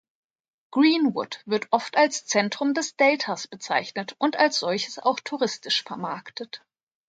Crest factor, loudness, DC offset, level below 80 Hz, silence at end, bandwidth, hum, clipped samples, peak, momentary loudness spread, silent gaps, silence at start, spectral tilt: 20 dB; -24 LUFS; under 0.1%; -78 dBFS; 0.5 s; 9.4 kHz; none; under 0.1%; -4 dBFS; 12 LU; none; 0.7 s; -3 dB/octave